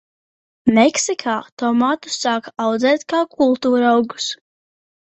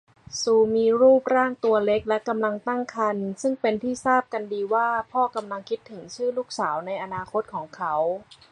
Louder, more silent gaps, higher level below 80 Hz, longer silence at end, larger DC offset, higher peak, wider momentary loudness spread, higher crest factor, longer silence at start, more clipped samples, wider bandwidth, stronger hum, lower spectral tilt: first, -18 LUFS vs -24 LUFS; first, 1.52-1.57 s vs none; about the same, -62 dBFS vs -62 dBFS; first, 0.7 s vs 0.3 s; neither; first, -2 dBFS vs -6 dBFS; second, 9 LU vs 12 LU; about the same, 16 dB vs 18 dB; first, 0.65 s vs 0.3 s; neither; second, 8.4 kHz vs 10.5 kHz; neither; about the same, -3.5 dB/octave vs -4.5 dB/octave